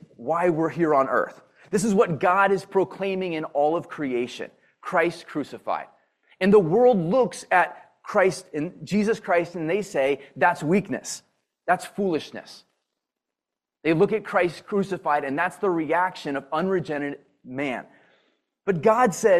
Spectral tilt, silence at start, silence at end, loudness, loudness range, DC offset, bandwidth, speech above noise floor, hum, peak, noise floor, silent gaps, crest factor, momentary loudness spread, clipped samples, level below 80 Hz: -5.5 dB/octave; 0.2 s; 0 s; -24 LUFS; 5 LU; under 0.1%; 14 kHz; 65 dB; none; -4 dBFS; -88 dBFS; none; 20 dB; 13 LU; under 0.1%; -66 dBFS